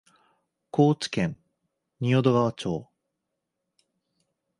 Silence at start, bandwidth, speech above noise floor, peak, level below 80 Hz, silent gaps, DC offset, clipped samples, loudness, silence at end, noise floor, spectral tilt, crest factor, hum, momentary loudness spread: 0.75 s; 11.5 kHz; 59 dB; -8 dBFS; -62 dBFS; none; under 0.1%; under 0.1%; -25 LUFS; 1.75 s; -82 dBFS; -7 dB/octave; 20 dB; none; 10 LU